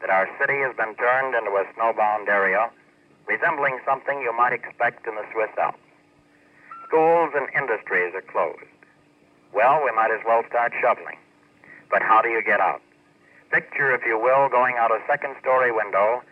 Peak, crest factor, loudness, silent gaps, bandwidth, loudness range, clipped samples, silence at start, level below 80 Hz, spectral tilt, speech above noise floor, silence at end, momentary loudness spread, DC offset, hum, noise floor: -6 dBFS; 18 dB; -22 LUFS; none; 5.6 kHz; 3 LU; under 0.1%; 0 s; -78 dBFS; -6.5 dB/octave; 36 dB; 0.1 s; 8 LU; under 0.1%; none; -57 dBFS